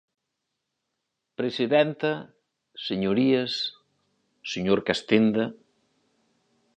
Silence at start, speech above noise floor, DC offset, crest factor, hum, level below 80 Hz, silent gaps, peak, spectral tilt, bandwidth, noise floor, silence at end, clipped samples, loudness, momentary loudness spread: 1.4 s; 57 dB; under 0.1%; 22 dB; none; -64 dBFS; none; -6 dBFS; -6 dB/octave; 9.2 kHz; -82 dBFS; 1.25 s; under 0.1%; -25 LUFS; 14 LU